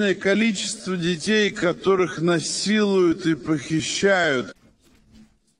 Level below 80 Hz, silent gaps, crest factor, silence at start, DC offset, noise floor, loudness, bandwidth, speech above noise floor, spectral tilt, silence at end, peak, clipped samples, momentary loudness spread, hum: -58 dBFS; none; 16 dB; 0 s; under 0.1%; -56 dBFS; -21 LUFS; 10.5 kHz; 35 dB; -4.5 dB/octave; 1.1 s; -6 dBFS; under 0.1%; 6 LU; none